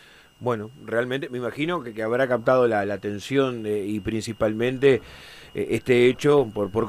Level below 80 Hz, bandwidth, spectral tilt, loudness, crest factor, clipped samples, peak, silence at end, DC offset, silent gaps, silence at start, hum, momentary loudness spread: -54 dBFS; 14.5 kHz; -6 dB/octave; -23 LUFS; 18 dB; under 0.1%; -6 dBFS; 0 s; under 0.1%; none; 0.4 s; none; 11 LU